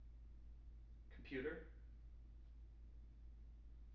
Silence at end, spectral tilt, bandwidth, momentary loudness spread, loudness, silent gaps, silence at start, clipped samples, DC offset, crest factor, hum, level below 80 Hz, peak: 0 s; -5.5 dB/octave; 6 kHz; 14 LU; -57 LUFS; none; 0 s; under 0.1%; under 0.1%; 20 dB; none; -60 dBFS; -34 dBFS